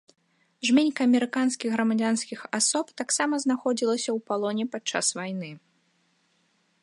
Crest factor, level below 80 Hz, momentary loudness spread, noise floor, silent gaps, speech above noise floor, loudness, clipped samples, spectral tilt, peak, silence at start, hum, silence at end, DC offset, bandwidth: 18 dB; -82 dBFS; 8 LU; -69 dBFS; none; 43 dB; -26 LUFS; under 0.1%; -3 dB/octave; -8 dBFS; 0.6 s; none; 1.25 s; under 0.1%; 11.5 kHz